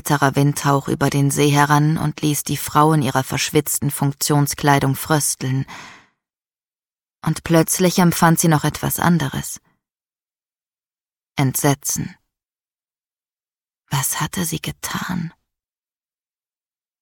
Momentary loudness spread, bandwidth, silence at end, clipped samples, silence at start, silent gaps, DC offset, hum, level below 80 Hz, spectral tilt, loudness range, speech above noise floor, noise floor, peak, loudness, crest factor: 11 LU; 18 kHz; 1.7 s; under 0.1%; 0.05 s; none; under 0.1%; none; -50 dBFS; -4.5 dB/octave; 8 LU; over 72 dB; under -90 dBFS; -2 dBFS; -18 LUFS; 18 dB